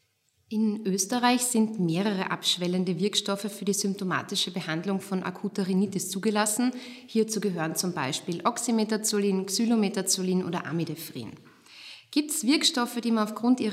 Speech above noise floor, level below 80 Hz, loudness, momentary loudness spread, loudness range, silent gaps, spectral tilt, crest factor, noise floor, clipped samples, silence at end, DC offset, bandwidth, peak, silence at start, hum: 43 dB; -80 dBFS; -27 LUFS; 8 LU; 2 LU; none; -4 dB/octave; 18 dB; -70 dBFS; under 0.1%; 0 s; under 0.1%; 16 kHz; -10 dBFS; 0.5 s; none